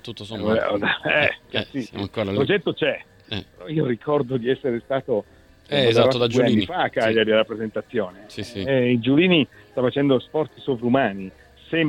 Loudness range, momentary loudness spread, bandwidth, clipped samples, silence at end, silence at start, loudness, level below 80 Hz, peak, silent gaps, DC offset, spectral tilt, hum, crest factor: 4 LU; 12 LU; 12 kHz; under 0.1%; 0 s; 0.05 s; -22 LUFS; -56 dBFS; -4 dBFS; none; under 0.1%; -6.5 dB/octave; none; 18 dB